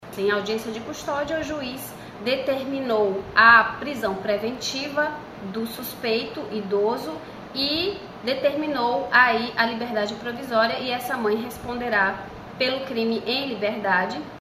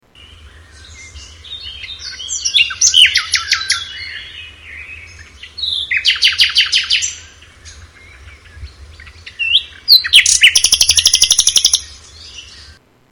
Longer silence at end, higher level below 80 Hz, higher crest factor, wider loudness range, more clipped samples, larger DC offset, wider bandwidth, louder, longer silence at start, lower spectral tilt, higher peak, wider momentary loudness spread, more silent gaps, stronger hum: second, 0 s vs 0.4 s; second, -54 dBFS vs -42 dBFS; first, 22 dB vs 16 dB; about the same, 6 LU vs 7 LU; neither; neither; second, 15 kHz vs over 20 kHz; second, -23 LUFS vs -10 LUFS; second, 0 s vs 0.45 s; first, -4 dB/octave vs 3 dB/octave; about the same, -2 dBFS vs 0 dBFS; second, 14 LU vs 24 LU; neither; neither